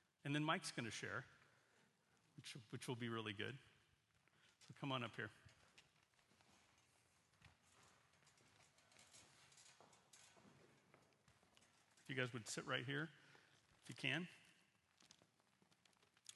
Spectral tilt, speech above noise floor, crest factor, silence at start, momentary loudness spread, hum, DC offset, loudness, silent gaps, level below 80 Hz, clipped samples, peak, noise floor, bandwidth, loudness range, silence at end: -4 dB/octave; 32 dB; 28 dB; 0.25 s; 23 LU; none; under 0.1%; -48 LUFS; none; -88 dBFS; under 0.1%; -26 dBFS; -80 dBFS; 12 kHz; 20 LU; 0 s